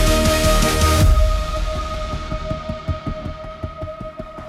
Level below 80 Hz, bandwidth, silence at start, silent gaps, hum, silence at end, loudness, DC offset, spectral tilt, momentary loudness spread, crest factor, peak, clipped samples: -22 dBFS; 16 kHz; 0 s; none; none; 0 s; -20 LUFS; under 0.1%; -4.5 dB/octave; 16 LU; 14 dB; -4 dBFS; under 0.1%